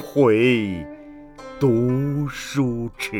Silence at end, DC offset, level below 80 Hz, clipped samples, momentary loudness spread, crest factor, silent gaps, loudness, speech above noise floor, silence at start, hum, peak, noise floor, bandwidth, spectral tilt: 0 s; under 0.1%; -46 dBFS; under 0.1%; 22 LU; 16 dB; none; -21 LUFS; 21 dB; 0 s; none; -6 dBFS; -41 dBFS; 18.5 kHz; -6.5 dB/octave